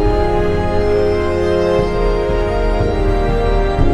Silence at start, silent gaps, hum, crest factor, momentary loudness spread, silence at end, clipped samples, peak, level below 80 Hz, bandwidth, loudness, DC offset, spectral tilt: 0 s; none; none; 12 dB; 2 LU; 0 s; under 0.1%; -2 dBFS; -18 dBFS; 9.6 kHz; -16 LUFS; under 0.1%; -7.5 dB/octave